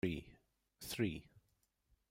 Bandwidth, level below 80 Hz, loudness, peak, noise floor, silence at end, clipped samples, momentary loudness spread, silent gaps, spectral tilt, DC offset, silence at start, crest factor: 16 kHz; -64 dBFS; -43 LUFS; -24 dBFS; -81 dBFS; 0.7 s; under 0.1%; 14 LU; none; -5.5 dB/octave; under 0.1%; 0.05 s; 20 dB